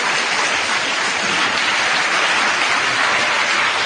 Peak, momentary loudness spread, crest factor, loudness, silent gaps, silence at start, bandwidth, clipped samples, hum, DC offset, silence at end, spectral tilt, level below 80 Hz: -4 dBFS; 2 LU; 14 dB; -15 LUFS; none; 0 s; 13 kHz; under 0.1%; none; under 0.1%; 0 s; -0.5 dB/octave; -58 dBFS